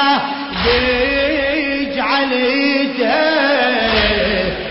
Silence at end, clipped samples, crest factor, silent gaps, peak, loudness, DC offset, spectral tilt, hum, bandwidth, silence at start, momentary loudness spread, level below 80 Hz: 0 s; under 0.1%; 14 dB; none; -2 dBFS; -15 LUFS; under 0.1%; -8.5 dB/octave; none; 5.8 kHz; 0 s; 4 LU; -34 dBFS